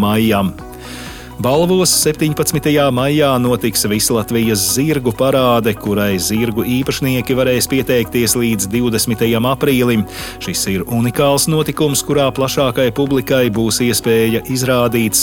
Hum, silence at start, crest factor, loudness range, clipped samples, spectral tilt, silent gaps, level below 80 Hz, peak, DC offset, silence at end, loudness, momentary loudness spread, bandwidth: none; 0 s; 14 dB; 2 LU; under 0.1%; -4.5 dB/octave; none; -38 dBFS; -2 dBFS; under 0.1%; 0 s; -14 LUFS; 4 LU; 17.5 kHz